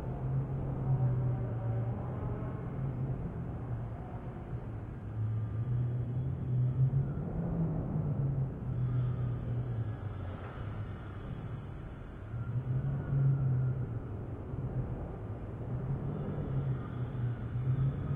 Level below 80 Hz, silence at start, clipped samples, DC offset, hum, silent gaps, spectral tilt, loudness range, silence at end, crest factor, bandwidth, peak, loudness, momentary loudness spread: -46 dBFS; 0 s; under 0.1%; under 0.1%; none; none; -11 dB/octave; 5 LU; 0 s; 14 dB; 3.6 kHz; -20 dBFS; -36 LUFS; 11 LU